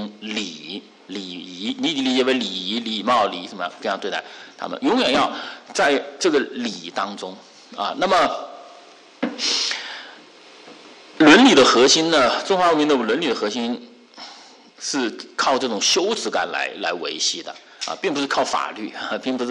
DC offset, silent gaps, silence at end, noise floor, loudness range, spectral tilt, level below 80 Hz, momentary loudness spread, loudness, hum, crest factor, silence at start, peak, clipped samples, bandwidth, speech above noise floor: under 0.1%; none; 0 s; -46 dBFS; 8 LU; -2.5 dB/octave; -60 dBFS; 18 LU; -20 LUFS; none; 18 dB; 0 s; -2 dBFS; under 0.1%; 11 kHz; 26 dB